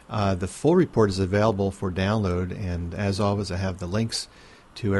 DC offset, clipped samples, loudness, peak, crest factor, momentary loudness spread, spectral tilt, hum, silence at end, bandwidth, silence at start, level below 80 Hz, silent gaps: under 0.1%; under 0.1%; -25 LUFS; -8 dBFS; 16 dB; 9 LU; -6.5 dB/octave; none; 0 s; 11.5 kHz; 0.1 s; -46 dBFS; none